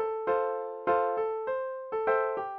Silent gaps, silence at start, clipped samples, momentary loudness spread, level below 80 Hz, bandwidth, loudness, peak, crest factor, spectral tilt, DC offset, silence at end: none; 0 s; under 0.1%; 6 LU; -70 dBFS; 4.6 kHz; -30 LUFS; -14 dBFS; 16 dB; -7.5 dB/octave; under 0.1%; 0 s